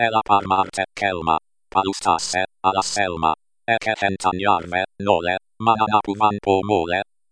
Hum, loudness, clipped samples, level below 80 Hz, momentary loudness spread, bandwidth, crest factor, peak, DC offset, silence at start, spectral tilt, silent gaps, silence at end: none; -21 LUFS; under 0.1%; -52 dBFS; 6 LU; 10.5 kHz; 20 dB; -2 dBFS; under 0.1%; 0 s; -4 dB/octave; none; 0.3 s